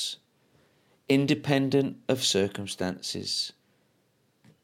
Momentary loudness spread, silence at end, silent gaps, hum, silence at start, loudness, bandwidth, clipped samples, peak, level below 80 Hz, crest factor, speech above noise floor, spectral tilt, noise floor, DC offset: 9 LU; 1.1 s; none; none; 0 s; -27 LUFS; 16.5 kHz; under 0.1%; -10 dBFS; -70 dBFS; 20 dB; 42 dB; -4.5 dB/octave; -69 dBFS; under 0.1%